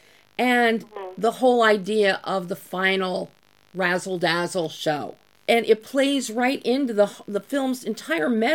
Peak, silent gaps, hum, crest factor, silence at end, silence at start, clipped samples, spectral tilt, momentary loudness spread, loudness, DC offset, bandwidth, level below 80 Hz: -4 dBFS; none; none; 18 dB; 0 s; 0.4 s; under 0.1%; -4.5 dB/octave; 12 LU; -23 LUFS; under 0.1%; 17.5 kHz; -76 dBFS